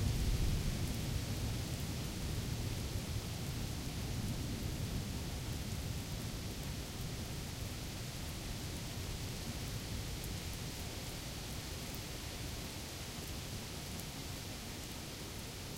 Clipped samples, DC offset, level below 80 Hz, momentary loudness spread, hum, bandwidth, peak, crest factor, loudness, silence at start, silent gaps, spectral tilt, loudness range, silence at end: under 0.1%; under 0.1%; -46 dBFS; 5 LU; none; 16.5 kHz; -22 dBFS; 18 dB; -42 LUFS; 0 s; none; -4.5 dB/octave; 3 LU; 0 s